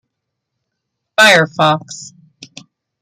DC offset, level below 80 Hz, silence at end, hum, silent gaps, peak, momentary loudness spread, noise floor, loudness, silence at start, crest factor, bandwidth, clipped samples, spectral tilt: under 0.1%; -62 dBFS; 0.95 s; none; none; 0 dBFS; 21 LU; -76 dBFS; -11 LUFS; 1.2 s; 16 dB; 16 kHz; under 0.1%; -3 dB/octave